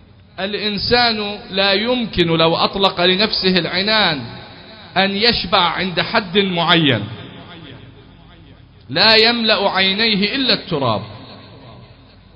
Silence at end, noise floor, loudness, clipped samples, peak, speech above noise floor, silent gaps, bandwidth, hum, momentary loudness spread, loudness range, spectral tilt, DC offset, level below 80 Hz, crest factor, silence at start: 0.5 s; -44 dBFS; -15 LUFS; under 0.1%; 0 dBFS; 28 dB; none; 8 kHz; none; 13 LU; 2 LU; -6.5 dB/octave; under 0.1%; -44 dBFS; 18 dB; 0.35 s